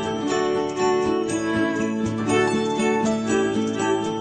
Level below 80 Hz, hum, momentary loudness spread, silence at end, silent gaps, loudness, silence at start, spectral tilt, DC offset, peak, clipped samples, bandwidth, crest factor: -54 dBFS; none; 3 LU; 0 s; none; -22 LUFS; 0 s; -5 dB/octave; under 0.1%; -8 dBFS; under 0.1%; 9.4 kHz; 14 dB